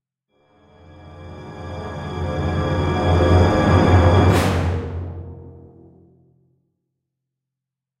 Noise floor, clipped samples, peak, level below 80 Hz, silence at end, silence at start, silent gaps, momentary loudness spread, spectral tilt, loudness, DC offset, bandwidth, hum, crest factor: -85 dBFS; under 0.1%; -2 dBFS; -34 dBFS; 2.4 s; 1.05 s; none; 23 LU; -7 dB/octave; -18 LUFS; under 0.1%; 12.5 kHz; none; 18 dB